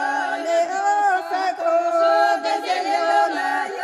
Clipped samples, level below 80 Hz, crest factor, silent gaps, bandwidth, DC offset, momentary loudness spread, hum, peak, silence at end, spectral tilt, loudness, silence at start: under 0.1%; -80 dBFS; 14 dB; none; 12.5 kHz; under 0.1%; 5 LU; none; -6 dBFS; 0 s; -1 dB/octave; -20 LUFS; 0 s